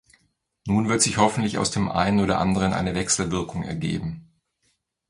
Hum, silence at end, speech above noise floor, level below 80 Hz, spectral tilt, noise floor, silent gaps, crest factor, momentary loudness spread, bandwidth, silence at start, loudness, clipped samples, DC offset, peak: none; 0.85 s; 48 dB; -46 dBFS; -4.5 dB/octave; -71 dBFS; none; 20 dB; 10 LU; 11.5 kHz; 0.65 s; -23 LUFS; under 0.1%; under 0.1%; -4 dBFS